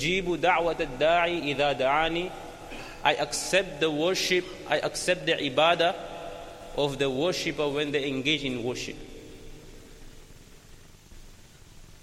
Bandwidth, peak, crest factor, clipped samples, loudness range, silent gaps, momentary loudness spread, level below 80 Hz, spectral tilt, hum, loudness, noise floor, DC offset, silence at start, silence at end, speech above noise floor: 15.5 kHz; -6 dBFS; 22 dB; under 0.1%; 7 LU; none; 17 LU; -50 dBFS; -3.5 dB/octave; none; -26 LUFS; -50 dBFS; under 0.1%; 0 s; 0.05 s; 24 dB